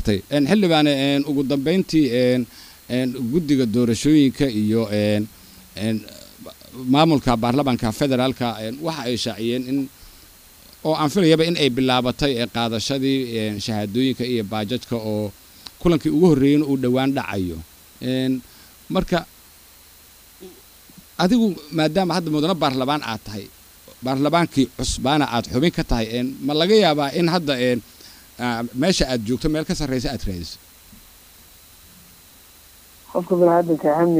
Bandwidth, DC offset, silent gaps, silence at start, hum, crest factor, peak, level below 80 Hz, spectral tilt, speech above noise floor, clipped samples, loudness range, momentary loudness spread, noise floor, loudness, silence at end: 16 kHz; under 0.1%; none; 0 s; none; 18 dB; -2 dBFS; -40 dBFS; -5.5 dB/octave; 28 dB; under 0.1%; 6 LU; 12 LU; -48 dBFS; -20 LUFS; 0 s